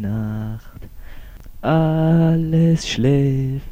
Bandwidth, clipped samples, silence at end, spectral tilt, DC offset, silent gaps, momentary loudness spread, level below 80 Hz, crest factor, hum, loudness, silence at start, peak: 15.5 kHz; under 0.1%; 0 s; -7.5 dB/octave; under 0.1%; none; 11 LU; -36 dBFS; 12 dB; none; -18 LUFS; 0 s; -6 dBFS